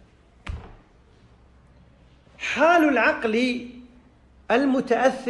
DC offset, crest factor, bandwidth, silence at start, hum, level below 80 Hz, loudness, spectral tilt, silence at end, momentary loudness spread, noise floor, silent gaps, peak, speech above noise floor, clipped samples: under 0.1%; 16 dB; 12 kHz; 0.45 s; none; -50 dBFS; -21 LUFS; -5 dB/octave; 0 s; 22 LU; -54 dBFS; none; -8 dBFS; 34 dB; under 0.1%